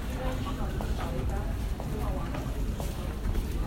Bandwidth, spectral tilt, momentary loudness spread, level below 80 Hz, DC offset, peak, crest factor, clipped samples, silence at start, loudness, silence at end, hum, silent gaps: 16 kHz; -6.5 dB/octave; 2 LU; -32 dBFS; under 0.1%; -18 dBFS; 14 dB; under 0.1%; 0 s; -34 LUFS; 0 s; none; none